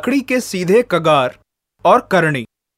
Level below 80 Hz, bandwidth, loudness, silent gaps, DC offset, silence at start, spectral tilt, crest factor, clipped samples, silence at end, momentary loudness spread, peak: -56 dBFS; 16 kHz; -15 LUFS; none; under 0.1%; 0 s; -5.5 dB/octave; 16 dB; under 0.1%; 0.35 s; 6 LU; 0 dBFS